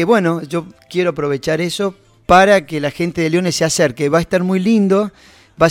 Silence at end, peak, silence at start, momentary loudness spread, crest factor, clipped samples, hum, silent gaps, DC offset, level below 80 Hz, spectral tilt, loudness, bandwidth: 0 s; 0 dBFS; 0 s; 11 LU; 16 dB; under 0.1%; none; none; under 0.1%; -44 dBFS; -5 dB/octave; -16 LUFS; 16.5 kHz